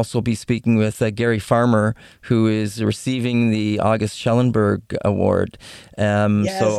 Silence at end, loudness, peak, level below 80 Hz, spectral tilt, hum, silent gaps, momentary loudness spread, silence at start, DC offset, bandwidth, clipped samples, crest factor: 0 s; -19 LUFS; -2 dBFS; -50 dBFS; -6.5 dB/octave; none; none; 5 LU; 0 s; under 0.1%; 13 kHz; under 0.1%; 16 dB